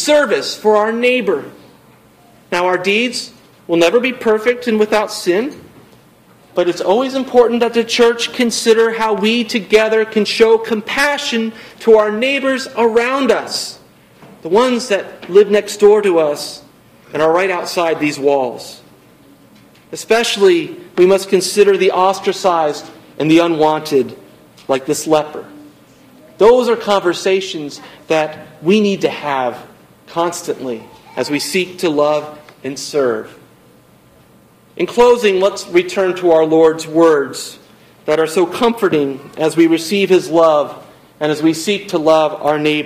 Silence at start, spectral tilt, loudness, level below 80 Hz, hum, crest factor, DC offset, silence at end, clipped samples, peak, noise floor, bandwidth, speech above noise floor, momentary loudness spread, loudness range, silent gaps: 0 s; -4 dB/octave; -14 LUFS; -54 dBFS; none; 14 dB; under 0.1%; 0 s; under 0.1%; 0 dBFS; -47 dBFS; 16 kHz; 33 dB; 12 LU; 5 LU; none